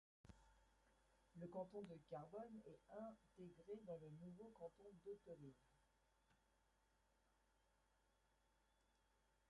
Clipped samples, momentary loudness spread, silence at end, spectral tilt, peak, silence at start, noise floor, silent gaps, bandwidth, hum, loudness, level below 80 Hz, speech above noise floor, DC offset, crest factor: under 0.1%; 8 LU; 0.6 s; -8 dB/octave; -42 dBFS; 0.25 s; -83 dBFS; none; 11 kHz; none; -59 LUFS; -82 dBFS; 25 dB; under 0.1%; 20 dB